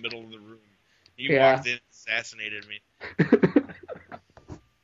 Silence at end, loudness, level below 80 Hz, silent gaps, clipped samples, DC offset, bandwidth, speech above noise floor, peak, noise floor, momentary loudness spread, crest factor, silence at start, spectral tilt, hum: 0.3 s; -24 LUFS; -62 dBFS; none; under 0.1%; under 0.1%; 7.8 kHz; 39 dB; -6 dBFS; -63 dBFS; 22 LU; 22 dB; 0 s; -6 dB/octave; none